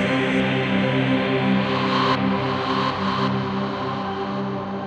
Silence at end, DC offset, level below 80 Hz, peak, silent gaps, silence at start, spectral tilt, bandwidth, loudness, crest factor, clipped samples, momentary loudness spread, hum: 0 s; under 0.1%; -52 dBFS; -8 dBFS; none; 0 s; -7 dB/octave; 9 kHz; -22 LUFS; 14 dB; under 0.1%; 6 LU; none